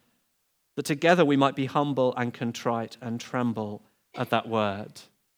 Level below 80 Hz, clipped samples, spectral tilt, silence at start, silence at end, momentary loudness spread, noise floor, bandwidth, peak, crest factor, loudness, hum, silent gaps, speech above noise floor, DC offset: -80 dBFS; under 0.1%; -6 dB/octave; 0.75 s; 0.35 s; 16 LU; -73 dBFS; over 20 kHz; -6 dBFS; 22 dB; -27 LUFS; none; none; 47 dB; under 0.1%